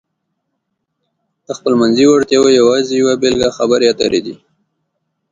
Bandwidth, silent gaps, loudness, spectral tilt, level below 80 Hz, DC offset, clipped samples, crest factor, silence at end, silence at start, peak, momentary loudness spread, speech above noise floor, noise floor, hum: 9.4 kHz; none; -12 LUFS; -4 dB/octave; -50 dBFS; under 0.1%; under 0.1%; 14 dB; 0.95 s; 1.5 s; 0 dBFS; 9 LU; 60 dB; -71 dBFS; none